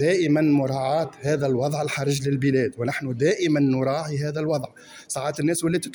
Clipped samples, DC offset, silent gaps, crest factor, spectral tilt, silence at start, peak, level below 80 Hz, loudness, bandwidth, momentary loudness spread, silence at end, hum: under 0.1%; under 0.1%; none; 14 dB; -6 dB/octave; 0 s; -8 dBFS; -60 dBFS; -23 LUFS; over 20 kHz; 7 LU; 0 s; none